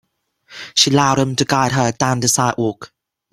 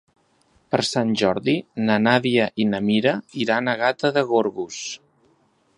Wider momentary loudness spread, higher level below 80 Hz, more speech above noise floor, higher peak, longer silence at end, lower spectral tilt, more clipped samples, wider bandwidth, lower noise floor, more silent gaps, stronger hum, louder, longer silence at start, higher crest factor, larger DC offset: about the same, 10 LU vs 10 LU; first, -52 dBFS vs -62 dBFS; second, 36 dB vs 41 dB; about the same, 0 dBFS vs -2 dBFS; second, 0.45 s vs 0.8 s; second, -3.5 dB/octave vs -5 dB/octave; neither; first, 16 kHz vs 11 kHz; second, -52 dBFS vs -62 dBFS; neither; neither; first, -16 LUFS vs -21 LUFS; second, 0.5 s vs 0.7 s; about the same, 18 dB vs 20 dB; neither